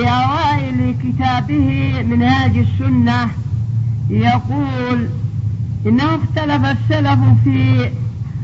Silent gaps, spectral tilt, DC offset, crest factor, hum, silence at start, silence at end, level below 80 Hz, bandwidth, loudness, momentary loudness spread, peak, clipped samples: none; -8 dB/octave; under 0.1%; 14 dB; none; 0 s; 0 s; -36 dBFS; 7.2 kHz; -16 LUFS; 8 LU; 0 dBFS; under 0.1%